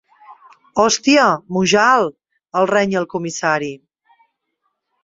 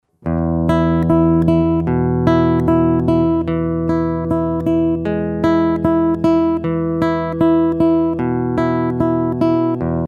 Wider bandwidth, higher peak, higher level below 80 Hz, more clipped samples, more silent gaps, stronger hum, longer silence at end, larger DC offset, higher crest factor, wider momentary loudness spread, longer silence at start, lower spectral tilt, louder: first, 8 kHz vs 4.9 kHz; about the same, -2 dBFS vs -2 dBFS; second, -58 dBFS vs -34 dBFS; neither; neither; neither; first, 1.25 s vs 0 s; neither; about the same, 18 dB vs 14 dB; first, 11 LU vs 5 LU; about the same, 0.3 s vs 0.25 s; second, -3.5 dB/octave vs -9.5 dB/octave; about the same, -16 LUFS vs -16 LUFS